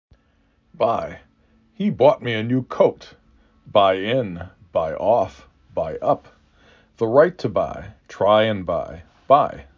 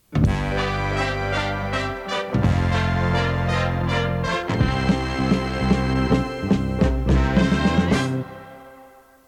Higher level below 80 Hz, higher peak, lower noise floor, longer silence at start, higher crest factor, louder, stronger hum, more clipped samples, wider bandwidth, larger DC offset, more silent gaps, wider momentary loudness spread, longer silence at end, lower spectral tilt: second, -50 dBFS vs -30 dBFS; about the same, -2 dBFS vs -4 dBFS; first, -61 dBFS vs -48 dBFS; first, 0.8 s vs 0.1 s; about the same, 20 dB vs 16 dB; about the same, -20 LUFS vs -22 LUFS; neither; neither; second, 7 kHz vs 12 kHz; neither; neither; first, 12 LU vs 6 LU; second, 0.15 s vs 0.4 s; about the same, -7 dB/octave vs -6.5 dB/octave